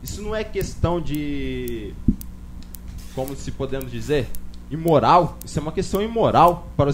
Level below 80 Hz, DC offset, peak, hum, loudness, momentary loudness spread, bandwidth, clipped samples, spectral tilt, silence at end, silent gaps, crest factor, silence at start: -34 dBFS; under 0.1%; -2 dBFS; 60 Hz at -40 dBFS; -22 LUFS; 20 LU; 16 kHz; under 0.1%; -6.5 dB/octave; 0 s; none; 20 dB; 0 s